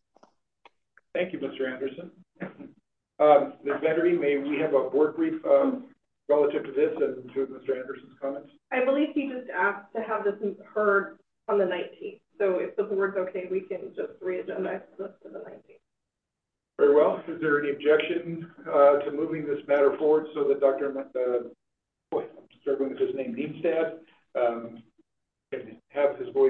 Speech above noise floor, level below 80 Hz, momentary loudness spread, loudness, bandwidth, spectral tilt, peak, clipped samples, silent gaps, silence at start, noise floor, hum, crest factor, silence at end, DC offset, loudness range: 60 dB; -80 dBFS; 17 LU; -27 LUFS; 4.1 kHz; -8.5 dB/octave; -6 dBFS; under 0.1%; none; 1.15 s; -86 dBFS; none; 20 dB; 0 s; under 0.1%; 7 LU